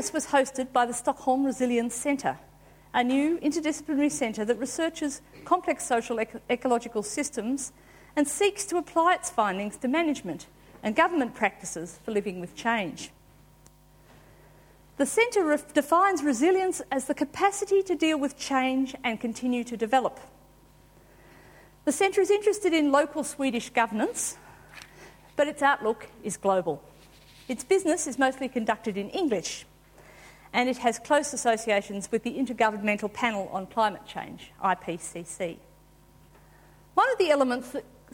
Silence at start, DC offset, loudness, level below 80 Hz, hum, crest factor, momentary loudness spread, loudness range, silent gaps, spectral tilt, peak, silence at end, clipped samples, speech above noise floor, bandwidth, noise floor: 0 s; under 0.1%; -27 LUFS; -62 dBFS; none; 20 dB; 12 LU; 5 LU; none; -3.5 dB/octave; -8 dBFS; 0.3 s; under 0.1%; 30 dB; 17 kHz; -56 dBFS